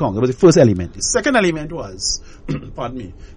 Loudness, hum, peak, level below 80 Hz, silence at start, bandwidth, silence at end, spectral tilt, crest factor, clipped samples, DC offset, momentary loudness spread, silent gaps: -16 LUFS; none; -2 dBFS; -38 dBFS; 0 s; 10.5 kHz; 0.05 s; -4.5 dB/octave; 16 dB; under 0.1%; under 0.1%; 16 LU; none